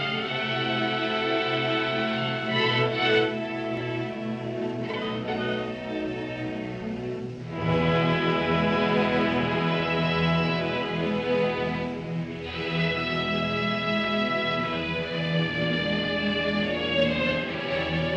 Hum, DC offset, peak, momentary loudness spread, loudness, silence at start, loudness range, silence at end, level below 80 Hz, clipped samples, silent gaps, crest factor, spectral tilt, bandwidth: none; under 0.1%; -10 dBFS; 8 LU; -26 LUFS; 0 s; 6 LU; 0 s; -52 dBFS; under 0.1%; none; 16 dB; -6.5 dB/octave; 8 kHz